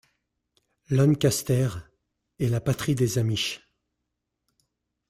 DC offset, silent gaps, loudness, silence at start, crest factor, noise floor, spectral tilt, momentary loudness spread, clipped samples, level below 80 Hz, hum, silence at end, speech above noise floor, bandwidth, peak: under 0.1%; none; -25 LUFS; 0.9 s; 18 dB; -82 dBFS; -5.5 dB/octave; 9 LU; under 0.1%; -56 dBFS; none; 1.5 s; 58 dB; 16 kHz; -10 dBFS